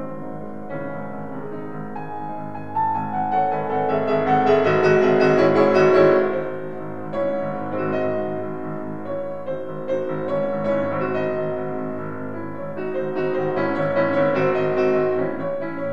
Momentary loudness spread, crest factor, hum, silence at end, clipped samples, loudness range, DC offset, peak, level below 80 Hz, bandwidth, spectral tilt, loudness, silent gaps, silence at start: 15 LU; 18 dB; none; 0 s; under 0.1%; 9 LU; 2%; -4 dBFS; -62 dBFS; 7.4 kHz; -8 dB/octave; -22 LUFS; none; 0 s